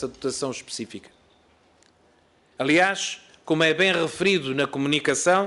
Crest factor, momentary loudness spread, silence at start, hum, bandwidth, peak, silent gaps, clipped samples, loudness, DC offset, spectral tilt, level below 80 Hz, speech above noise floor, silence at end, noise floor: 18 dB; 14 LU; 0 s; none; 11.5 kHz; -8 dBFS; none; under 0.1%; -23 LUFS; under 0.1%; -3.5 dB/octave; -64 dBFS; 37 dB; 0 s; -60 dBFS